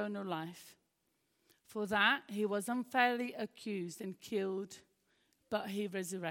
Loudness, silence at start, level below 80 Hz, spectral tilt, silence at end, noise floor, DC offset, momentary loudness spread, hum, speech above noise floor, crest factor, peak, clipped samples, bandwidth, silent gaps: -37 LUFS; 0 s; -82 dBFS; -4 dB/octave; 0 s; -81 dBFS; under 0.1%; 15 LU; none; 43 dB; 24 dB; -16 dBFS; under 0.1%; 17 kHz; none